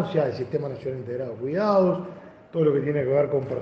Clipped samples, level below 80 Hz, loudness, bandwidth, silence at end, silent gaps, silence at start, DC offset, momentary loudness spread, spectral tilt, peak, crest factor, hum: under 0.1%; -64 dBFS; -25 LUFS; 6.8 kHz; 0 s; none; 0 s; under 0.1%; 11 LU; -9.5 dB/octave; -8 dBFS; 16 dB; none